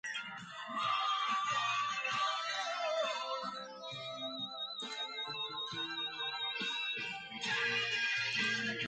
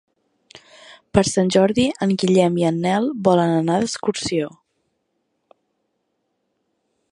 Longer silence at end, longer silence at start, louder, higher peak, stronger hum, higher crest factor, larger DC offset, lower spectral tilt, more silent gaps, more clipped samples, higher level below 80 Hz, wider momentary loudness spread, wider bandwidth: second, 0 s vs 2.65 s; second, 0.05 s vs 0.9 s; second, -36 LUFS vs -19 LUFS; second, -22 dBFS vs 0 dBFS; neither; about the same, 16 dB vs 20 dB; neither; second, -1.5 dB/octave vs -5.5 dB/octave; neither; neither; second, -82 dBFS vs -50 dBFS; about the same, 9 LU vs 7 LU; second, 9.2 kHz vs 11 kHz